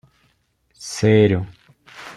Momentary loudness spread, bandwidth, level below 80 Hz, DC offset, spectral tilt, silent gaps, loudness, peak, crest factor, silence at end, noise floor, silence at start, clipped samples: 22 LU; 12 kHz; -54 dBFS; under 0.1%; -6.5 dB/octave; none; -18 LUFS; -2 dBFS; 18 dB; 0.05 s; -64 dBFS; 0.8 s; under 0.1%